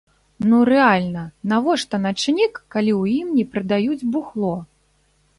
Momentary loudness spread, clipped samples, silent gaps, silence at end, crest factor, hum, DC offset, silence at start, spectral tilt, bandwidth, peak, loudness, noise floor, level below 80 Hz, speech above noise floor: 10 LU; under 0.1%; none; 0.75 s; 16 dB; none; under 0.1%; 0.4 s; -5.5 dB/octave; 11.5 kHz; -4 dBFS; -19 LUFS; -61 dBFS; -56 dBFS; 43 dB